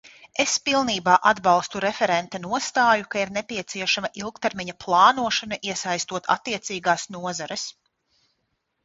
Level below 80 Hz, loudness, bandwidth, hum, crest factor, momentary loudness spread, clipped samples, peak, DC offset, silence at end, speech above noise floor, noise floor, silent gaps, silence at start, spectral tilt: -62 dBFS; -23 LUFS; 8 kHz; none; 22 dB; 12 LU; under 0.1%; -2 dBFS; under 0.1%; 1.15 s; 52 dB; -75 dBFS; none; 0.25 s; -2.5 dB/octave